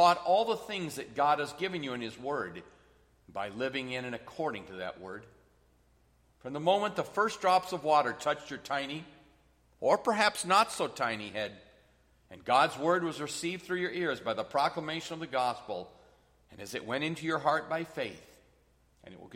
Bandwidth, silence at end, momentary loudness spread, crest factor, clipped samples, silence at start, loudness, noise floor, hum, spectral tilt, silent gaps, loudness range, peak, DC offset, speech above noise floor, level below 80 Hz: 16 kHz; 0 s; 14 LU; 22 dB; under 0.1%; 0 s; -32 LUFS; -67 dBFS; none; -4 dB/octave; none; 8 LU; -12 dBFS; under 0.1%; 35 dB; -68 dBFS